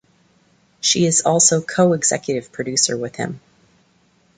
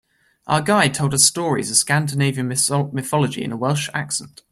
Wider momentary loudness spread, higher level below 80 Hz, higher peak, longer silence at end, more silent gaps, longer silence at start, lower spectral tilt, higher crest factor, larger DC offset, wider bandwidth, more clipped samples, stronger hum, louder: first, 13 LU vs 8 LU; about the same, -60 dBFS vs -56 dBFS; about the same, -2 dBFS vs 0 dBFS; first, 1 s vs 0.25 s; neither; first, 0.85 s vs 0.45 s; about the same, -3 dB/octave vs -3.5 dB/octave; about the same, 20 dB vs 20 dB; neither; second, 9.6 kHz vs 15.5 kHz; neither; neither; about the same, -17 LUFS vs -19 LUFS